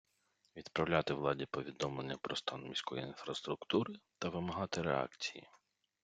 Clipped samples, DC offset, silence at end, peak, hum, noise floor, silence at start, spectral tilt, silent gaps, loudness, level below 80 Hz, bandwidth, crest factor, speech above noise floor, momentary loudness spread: under 0.1%; under 0.1%; 0.45 s; -16 dBFS; none; -78 dBFS; 0.55 s; -5 dB/octave; none; -39 LUFS; -70 dBFS; 9.4 kHz; 24 dB; 39 dB; 9 LU